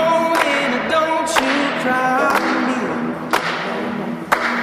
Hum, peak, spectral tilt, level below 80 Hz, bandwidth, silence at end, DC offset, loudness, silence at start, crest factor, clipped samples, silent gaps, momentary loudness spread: none; 0 dBFS; -3.5 dB/octave; -56 dBFS; 16 kHz; 0 s; under 0.1%; -18 LUFS; 0 s; 18 dB; under 0.1%; none; 7 LU